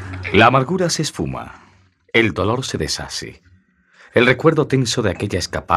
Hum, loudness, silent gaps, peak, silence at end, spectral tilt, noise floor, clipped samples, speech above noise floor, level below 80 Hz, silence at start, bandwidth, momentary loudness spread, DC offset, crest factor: none; -18 LUFS; none; 0 dBFS; 0 s; -4.5 dB/octave; -54 dBFS; under 0.1%; 37 dB; -46 dBFS; 0 s; 14 kHz; 14 LU; under 0.1%; 18 dB